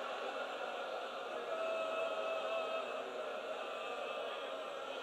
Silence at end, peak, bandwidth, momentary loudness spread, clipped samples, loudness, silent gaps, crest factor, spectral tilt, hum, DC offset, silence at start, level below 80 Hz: 0 s; -28 dBFS; 13.5 kHz; 5 LU; under 0.1%; -41 LUFS; none; 14 dB; -2 dB/octave; none; under 0.1%; 0 s; -88 dBFS